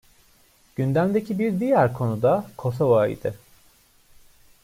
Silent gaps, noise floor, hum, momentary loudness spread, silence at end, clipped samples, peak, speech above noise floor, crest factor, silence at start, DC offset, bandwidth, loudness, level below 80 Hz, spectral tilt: none; -58 dBFS; none; 10 LU; 1.25 s; under 0.1%; -6 dBFS; 36 dB; 18 dB; 0.8 s; under 0.1%; 16 kHz; -23 LUFS; -58 dBFS; -8.5 dB/octave